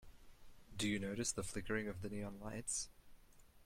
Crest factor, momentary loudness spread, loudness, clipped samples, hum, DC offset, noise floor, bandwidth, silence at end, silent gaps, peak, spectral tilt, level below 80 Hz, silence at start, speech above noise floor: 18 dB; 7 LU; -43 LUFS; under 0.1%; none; under 0.1%; -64 dBFS; 16.5 kHz; 0 s; none; -26 dBFS; -3.5 dB/octave; -60 dBFS; 0 s; 21 dB